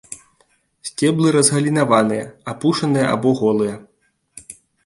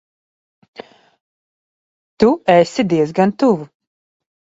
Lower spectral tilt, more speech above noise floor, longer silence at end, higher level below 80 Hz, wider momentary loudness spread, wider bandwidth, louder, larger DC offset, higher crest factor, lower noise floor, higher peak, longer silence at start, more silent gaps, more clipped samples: second, -5 dB/octave vs -6.5 dB/octave; second, 44 dB vs over 76 dB; second, 0.35 s vs 0.95 s; about the same, -58 dBFS vs -56 dBFS; first, 22 LU vs 4 LU; first, 11.5 kHz vs 8 kHz; about the same, -17 LUFS vs -15 LUFS; neither; about the same, 18 dB vs 18 dB; second, -61 dBFS vs under -90 dBFS; about the same, 0 dBFS vs 0 dBFS; second, 0.1 s vs 0.8 s; second, none vs 1.21-2.17 s; neither